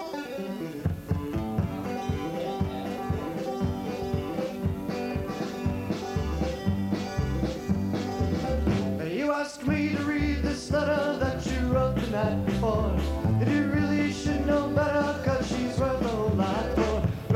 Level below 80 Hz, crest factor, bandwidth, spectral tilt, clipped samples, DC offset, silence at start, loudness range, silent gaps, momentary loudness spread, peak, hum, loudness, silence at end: -38 dBFS; 16 dB; 16.5 kHz; -7 dB/octave; under 0.1%; under 0.1%; 0 s; 5 LU; none; 6 LU; -12 dBFS; none; -28 LUFS; 0 s